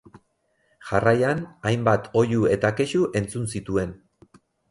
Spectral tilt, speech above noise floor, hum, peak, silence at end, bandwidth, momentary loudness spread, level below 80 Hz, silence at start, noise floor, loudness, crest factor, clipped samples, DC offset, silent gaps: -6.5 dB/octave; 47 dB; none; -6 dBFS; 0.75 s; 11.5 kHz; 8 LU; -50 dBFS; 0.8 s; -69 dBFS; -23 LUFS; 18 dB; under 0.1%; under 0.1%; none